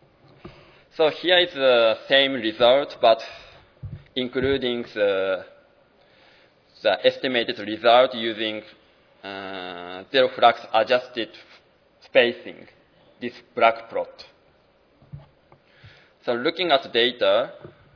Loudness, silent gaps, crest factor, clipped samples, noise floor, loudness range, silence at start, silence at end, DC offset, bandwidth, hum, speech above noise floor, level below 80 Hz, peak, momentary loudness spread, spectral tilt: -21 LUFS; none; 22 dB; under 0.1%; -60 dBFS; 8 LU; 0.45 s; 0.3 s; under 0.1%; 5.4 kHz; none; 38 dB; -60 dBFS; 0 dBFS; 18 LU; -5.5 dB/octave